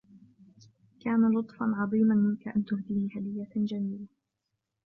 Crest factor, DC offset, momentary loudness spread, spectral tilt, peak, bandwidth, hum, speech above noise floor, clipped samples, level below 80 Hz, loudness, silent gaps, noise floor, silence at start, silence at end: 14 dB; under 0.1%; 11 LU; -10 dB/octave; -16 dBFS; 5.6 kHz; none; 55 dB; under 0.1%; -70 dBFS; -29 LUFS; none; -84 dBFS; 0.15 s; 0.8 s